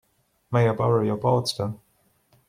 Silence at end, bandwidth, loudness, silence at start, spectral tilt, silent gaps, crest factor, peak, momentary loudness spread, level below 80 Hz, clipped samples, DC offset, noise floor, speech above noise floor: 0.7 s; 14.5 kHz; -24 LUFS; 0.5 s; -6.5 dB/octave; none; 18 dB; -8 dBFS; 10 LU; -60 dBFS; under 0.1%; under 0.1%; -65 dBFS; 43 dB